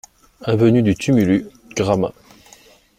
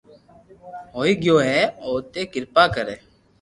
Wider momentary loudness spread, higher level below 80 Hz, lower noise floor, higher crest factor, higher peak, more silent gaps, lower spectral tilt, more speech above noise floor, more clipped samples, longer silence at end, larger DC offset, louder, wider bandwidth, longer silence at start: second, 12 LU vs 20 LU; about the same, -48 dBFS vs -52 dBFS; about the same, -49 dBFS vs -50 dBFS; about the same, 16 dB vs 20 dB; about the same, -2 dBFS vs -2 dBFS; neither; first, -7 dB/octave vs -5 dB/octave; first, 33 dB vs 29 dB; neither; first, 0.9 s vs 0.45 s; neither; about the same, -18 LUFS vs -20 LUFS; first, 16 kHz vs 11.5 kHz; second, 0.4 s vs 0.65 s